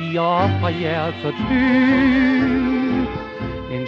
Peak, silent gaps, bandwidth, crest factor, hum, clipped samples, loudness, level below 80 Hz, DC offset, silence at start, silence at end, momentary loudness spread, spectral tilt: -4 dBFS; none; 6.2 kHz; 14 dB; none; under 0.1%; -19 LUFS; -40 dBFS; under 0.1%; 0 s; 0 s; 11 LU; -8 dB/octave